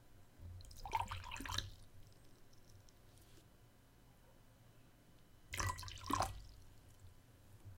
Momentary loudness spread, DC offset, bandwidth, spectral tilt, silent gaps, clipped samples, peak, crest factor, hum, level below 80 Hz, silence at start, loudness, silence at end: 25 LU; under 0.1%; 16.5 kHz; -3 dB/octave; none; under 0.1%; -22 dBFS; 28 dB; none; -58 dBFS; 0 s; -45 LUFS; 0 s